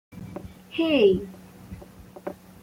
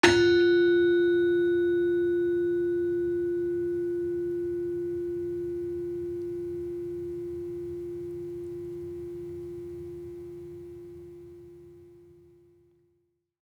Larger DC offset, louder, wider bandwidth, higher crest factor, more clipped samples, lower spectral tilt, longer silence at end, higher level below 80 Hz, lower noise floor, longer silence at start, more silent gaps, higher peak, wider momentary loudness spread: neither; first, -23 LUFS vs -28 LUFS; first, 16 kHz vs 10 kHz; second, 18 dB vs 24 dB; neither; about the same, -6.5 dB/octave vs -5.5 dB/octave; second, 0.3 s vs 1.55 s; first, -52 dBFS vs -60 dBFS; second, -46 dBFS vs -74 dBFS; about the same, 0.15 s vs 0.05 s; neither; second, -8 dBFS vs -4 dBFS; first, 24 LU vs 20 LU